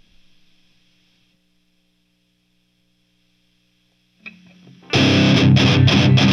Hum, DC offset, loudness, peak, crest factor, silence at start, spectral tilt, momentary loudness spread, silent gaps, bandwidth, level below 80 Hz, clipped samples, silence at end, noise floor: 60 Hz at -60 dBFS; under 0.1%; -14 LUFS; -2 dBFS; 18 dB; 4.25 s; -6 dB/octave; 7 LU; none; 7.6 kHz; -48 dBFS; under 0.1%; 0 s; -65 dBFS